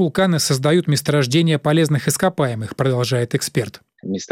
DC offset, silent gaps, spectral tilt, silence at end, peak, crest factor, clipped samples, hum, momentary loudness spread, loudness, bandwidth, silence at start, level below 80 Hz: under 0.1%; none; -5 dB/octave; 0.05 s; -6 dBFS; 12 dB; under 0.1%; none; 8 LU; -18 LUFS; 17 kHz; 0 s; -58 dBFS